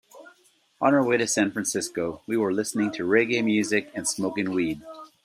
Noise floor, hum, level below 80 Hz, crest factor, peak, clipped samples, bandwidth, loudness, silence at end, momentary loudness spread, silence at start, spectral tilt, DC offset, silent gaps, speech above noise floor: -62 dBFS; none; -66 dBFS; 18 dB; -6 dBFS; under 0.1%; 15.5 kHz; -25 LUFS; 0.2 s; 8 LU; 0.15 s; -4 dB/octave; under 0.1%; none; 37 dB